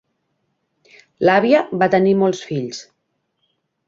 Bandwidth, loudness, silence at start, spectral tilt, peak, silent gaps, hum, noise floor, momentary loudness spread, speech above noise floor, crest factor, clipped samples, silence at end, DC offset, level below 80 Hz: 7.8 kHz; -17 LUFS; 1.2 s; -6 dB/octave; -2 dBFS; none; none; -72 dBFS; 12 LU; 55 dB; 18 dB; under 0.1%; 1.05 s; under 0.1%; -62 dBFS